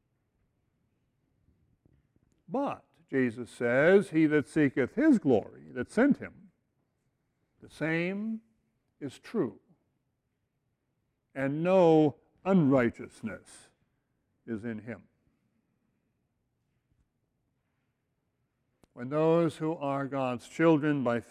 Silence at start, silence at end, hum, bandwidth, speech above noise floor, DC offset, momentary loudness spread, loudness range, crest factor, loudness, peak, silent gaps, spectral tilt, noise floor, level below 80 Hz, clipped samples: 2.5 s; 0.1 s; none; 11 kHz; 52 dB; under 0.1%; 18 LU; 17 LU; 20 dB; -28 LUFS; -12 dBFS; none; -7.5 dB/octave; -80 dBFS; -68 dBFS; under 0.1%